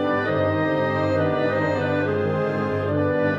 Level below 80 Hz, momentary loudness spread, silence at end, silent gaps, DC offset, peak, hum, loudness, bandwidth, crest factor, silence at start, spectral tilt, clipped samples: -58 dBFS; 2 LU; 0 s; none; under 0.1%; -10 dBFS; none; -22 LUFS; 7.4 kHz; 12 dB; 0 s; -8 dB/octave; under 0.1%